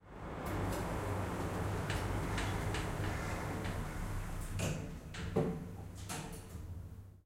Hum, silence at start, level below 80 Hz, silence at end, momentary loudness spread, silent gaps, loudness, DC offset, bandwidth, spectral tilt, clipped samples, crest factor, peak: none; 0 s; -46 dBFS; 0.05 s; 10 LU; none; -40 LUFS; under 0.1%; 16 kHz; -5.5 dB/octave; under 0.1%; 20 dB; -20 dBFS